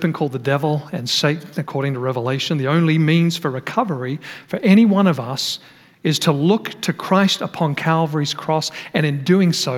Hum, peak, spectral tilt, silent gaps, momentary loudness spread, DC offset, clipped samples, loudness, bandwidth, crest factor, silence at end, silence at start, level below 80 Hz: none; -2 dBFS; -5.5 dB/octave; none; 9 LU; under 0.1%; under 0.1%; -19 LUFS; 16 kHz; 16 dB; 0 s; 0 s; -70 dBFS